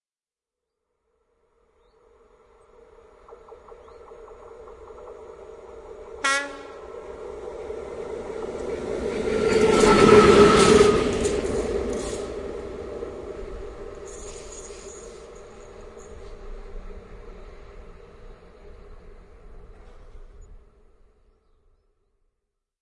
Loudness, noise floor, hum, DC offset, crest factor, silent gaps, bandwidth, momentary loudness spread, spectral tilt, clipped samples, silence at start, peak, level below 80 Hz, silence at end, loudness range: -20 LUFS; under -90 dBFS; none; under 0.1%; 24 dB; none; 11.5 kHz; 30 LU; -4.5 dB/octave; under 0.1%; 3.3 s; -2 dBFS; -42 dBFS; 2.25 s; 27 LU